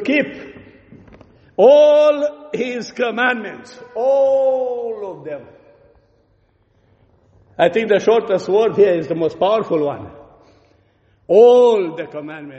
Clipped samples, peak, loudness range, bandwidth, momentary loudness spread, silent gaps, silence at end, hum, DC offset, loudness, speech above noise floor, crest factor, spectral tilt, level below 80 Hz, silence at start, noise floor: under 0.1%; 0 dBFS; 6 LU; 8 kHz; 20 LU; none; 0 s; none; under 0.1%; -15 LUFS; 43 dB; 16 dB; -5.5 dB/octave; -60 dBFS; 0 s; -59 dBFS